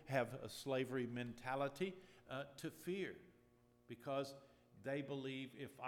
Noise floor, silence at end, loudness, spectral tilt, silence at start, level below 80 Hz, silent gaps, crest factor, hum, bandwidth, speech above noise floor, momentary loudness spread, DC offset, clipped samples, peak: -73 dBFS; 0 s; -46 LUFS; -5.5 dB/octave; 0 s; -80 dBFS; none; 22 dB; none; 19 kHz; 27 dB; 11 LU; under 0.1%; under 0.1%; -24 dBFS